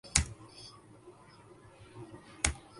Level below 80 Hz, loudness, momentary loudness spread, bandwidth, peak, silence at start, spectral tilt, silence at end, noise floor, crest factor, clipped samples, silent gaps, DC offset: -46 dBFS; -33 LUFS; 25 LU; 11.5 kHz; -2 dBFS; 0.05 s; -2 dB/octave; 0 s; -57 dBFS; 36 dB; under 0.1%; none; under 0.1%